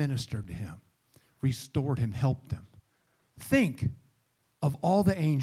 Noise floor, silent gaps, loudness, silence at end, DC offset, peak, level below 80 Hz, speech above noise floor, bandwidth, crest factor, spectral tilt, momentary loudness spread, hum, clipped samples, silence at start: -73 dBFS; none; -30 LUFS; 0 s; under 0.1%; -12 dBFS; -54 dBFS; 45 dB; 16 kHz; 18 dB; -7 dB/octave; 15 LU; none; under 0.1%; 0 s